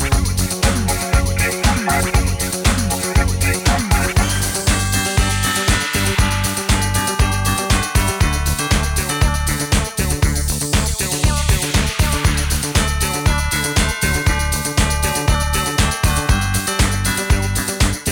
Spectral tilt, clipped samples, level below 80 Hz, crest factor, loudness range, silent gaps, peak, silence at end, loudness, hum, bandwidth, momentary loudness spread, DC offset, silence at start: -3.5 dB/octave; under 0.1%; -22 dBFS; 14 dB; 1 LU; none; -4 dBFS; 0 s; -17 LUFS; none; 18.5 kHz; 2 LU; under 0.1%; 0 s